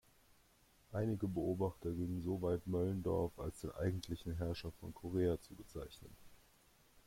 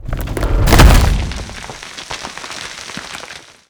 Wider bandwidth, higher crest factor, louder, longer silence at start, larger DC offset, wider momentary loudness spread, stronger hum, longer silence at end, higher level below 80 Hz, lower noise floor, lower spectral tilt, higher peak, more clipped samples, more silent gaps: second, 16.5 kHz vs over 20 kHz; about the same, 16 dB vs 14 dB; second, -41 LUFS vs -15 LUFS; first, 0.9 s vs 0.05 s; neither; second, 12 LU vs 20 LU; neither; second, 0.05 s vs 0.3 s; second, -60 dBFS vs -16 dBFS; first, -70 dBFS vs -35 dBFS; first, -7.5 dB/octave vs -4.5 dB/octave; second, -26 dBFS vs 0 dBFS; second, under 0.1% vs 0.5%; neither